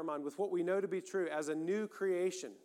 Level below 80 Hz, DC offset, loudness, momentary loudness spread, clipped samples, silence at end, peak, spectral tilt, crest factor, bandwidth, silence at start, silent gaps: under -90 dBFS; under 0.1%; -37 LUFS; 4 LU; under 0.1%; 0.1 s; -24 dBFS; -5 dB/octave; 14 dB; 14 kHz; 0 s; none